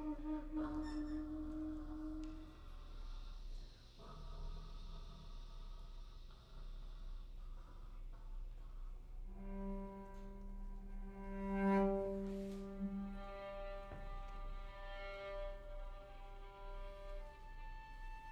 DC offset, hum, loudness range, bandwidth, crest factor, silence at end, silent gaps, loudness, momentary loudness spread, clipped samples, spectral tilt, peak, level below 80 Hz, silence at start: under 0.1%; none; 15 LU; 8.2 kHz; 20 dB; 0 s; none; -48 LUFS; 14 LU; under 0.1%; -7.5 dB/octave; -26 dBFS; -50 dBFS; 0 s